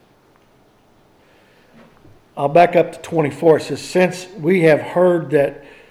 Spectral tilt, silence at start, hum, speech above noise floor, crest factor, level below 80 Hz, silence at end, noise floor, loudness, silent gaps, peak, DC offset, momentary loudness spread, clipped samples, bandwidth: -6.5 dB/octave; 2.35 s; none; 38 dB; 16 dB; -58 dBFS; 0.3 s; -53 dBFS; -16 LUFS; none; -2 dBFS; under 0.1%; 9 LU; under 0.1%; 13.5 kHz